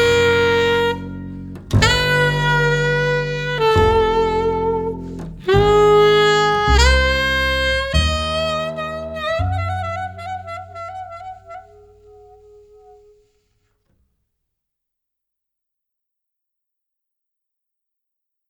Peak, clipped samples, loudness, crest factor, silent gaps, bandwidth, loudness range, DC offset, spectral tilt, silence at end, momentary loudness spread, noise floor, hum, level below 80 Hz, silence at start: 0 dBFS; under 0.1%; -17 LUFS; 18 dB; none; 17 kHz; 16 LU; under 0.1%; -4.5 dB/octave; 6.9 s; 18 LU; -79 dBFS; none; -30 dBFS; 0 s